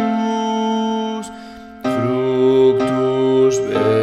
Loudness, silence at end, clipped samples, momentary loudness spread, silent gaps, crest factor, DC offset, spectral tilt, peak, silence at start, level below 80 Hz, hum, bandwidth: -17 LUFS; 0 s; under 0.1%; 13 LU; none; 14 dB; under 0.1%; -6 dB/octave; -4 dBFS; 0 s; -52 dBFS; none; 11 kHz